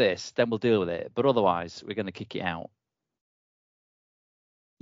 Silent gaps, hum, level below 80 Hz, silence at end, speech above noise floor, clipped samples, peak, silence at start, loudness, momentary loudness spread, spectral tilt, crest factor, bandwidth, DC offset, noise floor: none; none; -66 dBFS; 2.15 s; over 63 dB; under 0.1%; -8 dBFS; 0 s; -28 LUFS; 11 LU; -6 dB/octave; 20 dB; 7.6 kHz; under 0.1%; under -90 dBFS